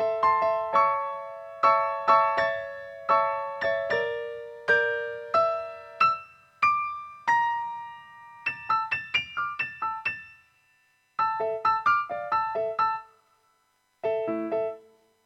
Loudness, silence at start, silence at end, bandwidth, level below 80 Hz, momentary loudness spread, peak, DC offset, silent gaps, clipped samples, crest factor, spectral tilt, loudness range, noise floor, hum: -26 LUFS; 0 s; 0.45 s; 9 kHz; -68 dBFS; 12 LU; -6 dBFS; under 0.1%; none; under 0.1%; 20 dB; -4 dB/octave; 5 LU; -70 dBFS; none